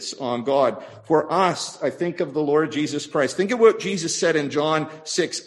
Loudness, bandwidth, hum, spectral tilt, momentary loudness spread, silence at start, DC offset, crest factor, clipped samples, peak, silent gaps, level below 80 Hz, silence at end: -22 LUFS; 12 kHz; none; -4 dB/octave; 9 LU; 0 s; under 0.1%; 18 dB; under 0.1%; -4 dBFS; none; -68 dBFS; 0.05 s